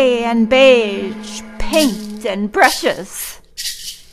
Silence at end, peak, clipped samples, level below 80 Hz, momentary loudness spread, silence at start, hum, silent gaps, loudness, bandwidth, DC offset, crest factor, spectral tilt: 0.1 s; 0 dBFS; under 0.1%; -36 dBFS; 17 LU; 0 s; none; none; -15 LUFS; 15.5 kHz; under 0.1%; 16 dB; -3 dB/octave